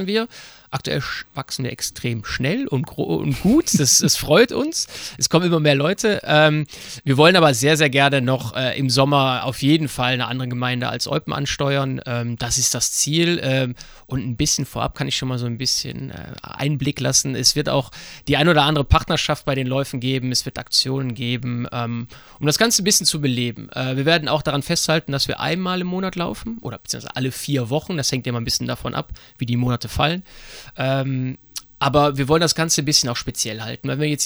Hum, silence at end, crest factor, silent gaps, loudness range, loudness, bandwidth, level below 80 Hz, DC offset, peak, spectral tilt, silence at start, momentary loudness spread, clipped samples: none; 0 s; 18 dB; none; 7 LU; -19 LUFS; over 20 kHz; -42 dBFS; under 0.1%; -2 dBFS; -3.5 dB/octave; 0 s; 13 LU; under 0.1%